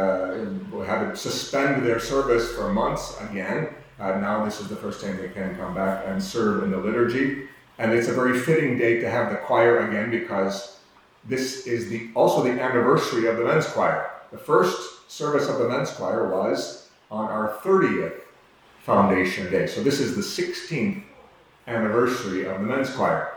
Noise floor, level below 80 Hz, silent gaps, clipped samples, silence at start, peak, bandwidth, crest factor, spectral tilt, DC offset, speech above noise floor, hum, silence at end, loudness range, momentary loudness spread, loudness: -54 dBFS; -54 dBFS; none; under 0.1%; 0 s; -4 dBFS; over 20 kHz; 20 dB; -5.5 dB/octave; under 0.1%; 30 dB; none; 0 s; 4 LU; 11 LU; -24 LUFS